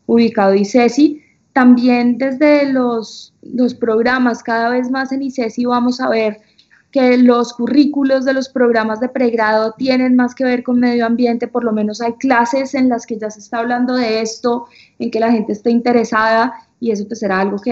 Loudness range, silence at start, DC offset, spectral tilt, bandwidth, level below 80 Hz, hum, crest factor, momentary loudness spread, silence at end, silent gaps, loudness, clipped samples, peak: 3 LU; 0.1 s; under 0.1%; -5.5 dB/octave; 7.6 kHz; -60 dBFS; none; 14 dB; 9 LU; 0 s; none; -15 LUFS; under 0.1%; 0 dBFS